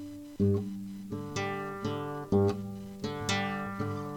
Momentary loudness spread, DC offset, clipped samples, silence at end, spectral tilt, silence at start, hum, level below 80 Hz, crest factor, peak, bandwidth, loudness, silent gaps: 12 LU; under 0.1%; under 0.1%; 0 s; -6 dB/octave; 0 s; none; -58 dBFS; 18 dB; -14 dBFS; 17.5 kHz; -33 LUFS; none